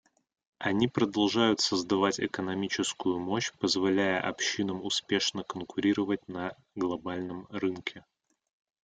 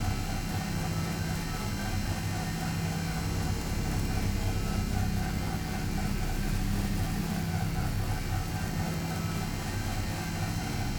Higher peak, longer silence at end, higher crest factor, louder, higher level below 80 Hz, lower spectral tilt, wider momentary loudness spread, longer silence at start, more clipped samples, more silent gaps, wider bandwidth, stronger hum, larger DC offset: first, -10 dBFS vs -16 dBFS; first, 0.85 s vs 0 s; about the same, 20 dB vs 16 dB; about the same, -30 LUFS vs -32 LUFS; second, -68 dBFS vs -36 dBFS; about the same, -4 dB/octave vs -5 dB/octave; first, 11 LU vs 2 LU; first, 0.6 s vs 0 s; neither; neither; second, 9.4 kHz vs over 20 kHz; neither; neither